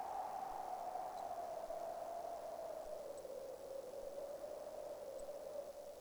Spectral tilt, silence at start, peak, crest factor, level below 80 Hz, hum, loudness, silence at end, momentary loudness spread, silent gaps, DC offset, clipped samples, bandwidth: -3.5 dB/octave; 0 s; -34 dBFS; 14 dB; -72 dBFS; none; -48 LUFS; 0 s; 4 LU; none; under 0.1%; under 0.1%; over 20 kHz